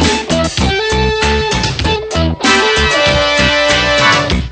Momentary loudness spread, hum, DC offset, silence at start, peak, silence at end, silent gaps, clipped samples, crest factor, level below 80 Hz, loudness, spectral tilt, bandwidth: 5 LU; none; under 0.1%; 0 s; 0 dBFS; 0 s; none; under 0.1%; 12 dB; -24 dBFS; -11 LUFS; -3.5 dB/octave; 9.2 kHz